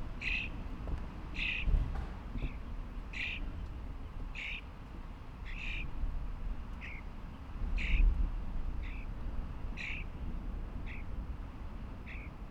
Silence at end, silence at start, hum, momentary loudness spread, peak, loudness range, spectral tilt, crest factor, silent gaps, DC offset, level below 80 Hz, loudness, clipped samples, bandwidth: 0 s; 0 s; none; 12 LU; -18 dBFS; 5 LU; -6 dB/octave; 20 dB; none; under 0.1%; -38 dBFS; -41 LUFS; under 0.1%; 7.2 kHz